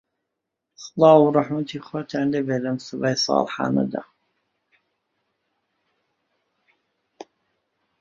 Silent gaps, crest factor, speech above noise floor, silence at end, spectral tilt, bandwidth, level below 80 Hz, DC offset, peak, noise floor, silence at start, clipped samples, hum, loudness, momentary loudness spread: none; 22 dB; 61 dB; 4 s; -5.5 dB/octave; 7.6 kHz; -66 dBFS; under 0.1%; -2 dBFS; -81 dBFS; 0.8 s; under 0.1%; none; -21 LUFS; 16 LU